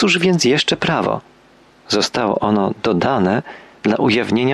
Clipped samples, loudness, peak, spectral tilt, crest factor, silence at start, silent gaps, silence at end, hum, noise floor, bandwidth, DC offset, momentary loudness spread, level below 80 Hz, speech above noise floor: under 0.1%; -17 LUFS; -4 dBFS; -4.5 dB/octave; 14 dB; 0 s; none; 0 s; none; -49 dBFS; 12.5 kHz; under 0.1%; 8 LU; -52 dBFS; 33 dB